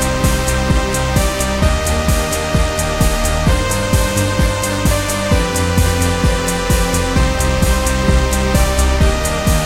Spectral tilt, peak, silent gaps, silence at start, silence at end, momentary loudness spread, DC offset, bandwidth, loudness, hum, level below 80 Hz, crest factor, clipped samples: -4.5 dB/octave; 0 dBFS; none; 0 s; 0 s; 2 LU; under 0.1%; 16.5 kHz; -15 LUFS; none; -18 dBFS; 14 dB; under 0.1%